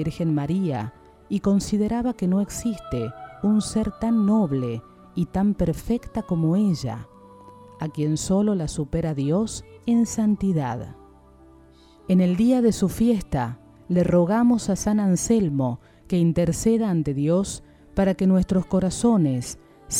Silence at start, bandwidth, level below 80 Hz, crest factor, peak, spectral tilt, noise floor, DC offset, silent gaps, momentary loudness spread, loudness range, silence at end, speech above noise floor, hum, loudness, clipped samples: 0 s; 15 kHz; -44 dBFS; 16 dB; -8 dBFS; -6.5 dB/octave; -51 dBFS; under 0.1%; none; 11 LU; 4 LU; 0 s; 29 dB; none; -23 LUFS; under 0.1%